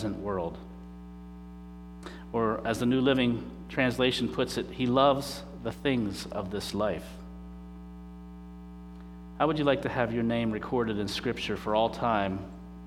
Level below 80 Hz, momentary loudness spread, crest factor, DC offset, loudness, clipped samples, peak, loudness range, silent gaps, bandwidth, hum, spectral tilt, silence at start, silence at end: -50 dBFS; 21 LU; 20 dB; under 0.1%; -29 LUFS; under 0.1%; -10 dBFS; 7 LU; none; 15.5 kHz; 60 Hz at -45 dBFS; -5.5 dB/octave; 0 s; 0 s